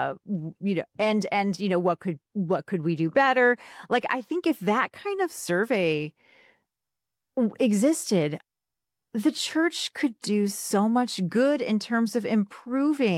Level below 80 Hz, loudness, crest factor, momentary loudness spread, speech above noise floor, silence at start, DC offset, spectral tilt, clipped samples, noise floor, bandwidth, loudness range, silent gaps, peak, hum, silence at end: -74 dBFS; -26 LUFS; 16 dB; 8 LU; 64 dB; 0 s; under 0.1%; -5 dB/octave; under 0.1%; -89 dBFS; 16 kHz; 3 LU; none; -10 dBFS; none; 0 s